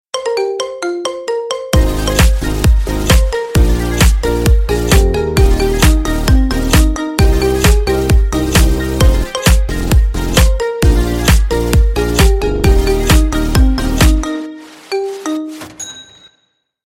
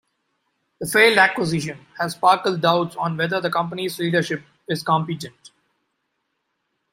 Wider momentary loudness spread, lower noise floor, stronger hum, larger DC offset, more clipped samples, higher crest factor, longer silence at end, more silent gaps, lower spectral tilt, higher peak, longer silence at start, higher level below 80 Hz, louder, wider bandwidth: second, 8 LU vs 15 LU; second, -62 dBFS vs -75 dBFS; neither; neither; neither; second, 12 dB vs 22 dB; second, 0.85 s vs 1.65 s; neither; about the same, -5 dB/octave vs -4.5 dB/octave; about the same, 0 dBFS vs 0 dBFS; second, 0.15 s vs 0.8 s; first, -14 dBFS vs -64 dBFS; first, -13 LUFS vs -20 LUFS; about the same, 16.5 kHz vs 16 kHz